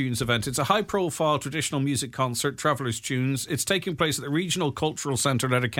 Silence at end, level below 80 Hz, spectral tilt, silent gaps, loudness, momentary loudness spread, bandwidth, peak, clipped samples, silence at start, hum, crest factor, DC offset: 0 s; -54 dBFS; -4 dB/octave; none; -26 LUFS; 3 LU; 18 kHz; -6 dBFS; under 0.1%; 0 s; none; 20 dB; under 0.1%